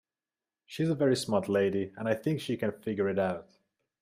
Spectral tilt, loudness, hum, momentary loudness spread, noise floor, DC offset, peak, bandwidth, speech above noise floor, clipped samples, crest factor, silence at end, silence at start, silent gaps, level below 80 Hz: -6 dB/octave; -30 LUFS; none; 6 LU; under -90 dBFS; under 0.1%; -12 dBFS; 15.5 kHz; over 60 dB; under 0.1%; 18 dB; 0.6 s; 0.7 s; none; -72 dBFS